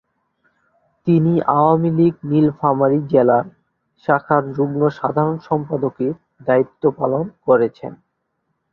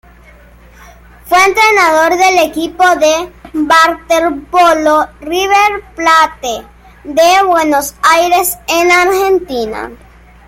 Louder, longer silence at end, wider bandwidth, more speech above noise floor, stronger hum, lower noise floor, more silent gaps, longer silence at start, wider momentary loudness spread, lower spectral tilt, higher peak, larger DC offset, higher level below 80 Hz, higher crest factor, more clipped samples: second, -18 LUFS vs -10 LUFS; first, 0.8 s vs 0.5 s; second, 5.8 kHz vs 17 kHz; first, 55 dB vs 29 dB; neither; first, -72 dBFS vs -39 dBFS; neither; second, 1.05 s vs 1.25 s; about the same, 9 LU vs 11 LU; first, -11 dB/octave vs -2 dB/octave; about the same, -2 dBFS vs 0 dBFS; neither; second, -58 dBFS vs -40 dBFS; about the same, 16 dB vs 12 dB; neither